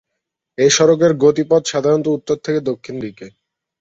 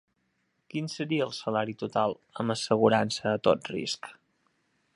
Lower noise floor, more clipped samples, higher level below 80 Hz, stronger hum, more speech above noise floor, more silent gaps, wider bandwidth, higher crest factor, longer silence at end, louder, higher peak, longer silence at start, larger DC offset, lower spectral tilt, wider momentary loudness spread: about the same, -78 dBFS vs -75 dBFS; neither; first, -58 dBFS vs -68 dBFS; neither; first, 63 dB vs 47 dB; neither; second, 8 kHz vs 11.5 kHz; second, 16 dB vs 22 dB; second, 0.5 s vs 0.85 s; first, -15 LUFS vs -29 LUFS; first, -2 dBFS vs -8 dBFS; second, 0.6 s vs 0.75 s; neither; about the same, -4.5 dB/octave vs -5 dB/octave; first, 16 LU vs 11 LU